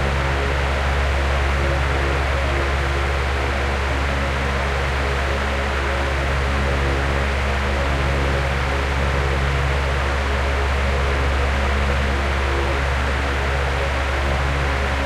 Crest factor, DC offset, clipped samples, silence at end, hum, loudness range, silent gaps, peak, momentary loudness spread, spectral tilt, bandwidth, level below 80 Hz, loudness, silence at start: 14 dB; under 0.1%; under 0.1%; 0 s; none; 1 LU; none; -6 dBFS; 1 LU; -5.5 dB/octave; 12 kHz; -22 dBFS; -21 LUFS; 0 s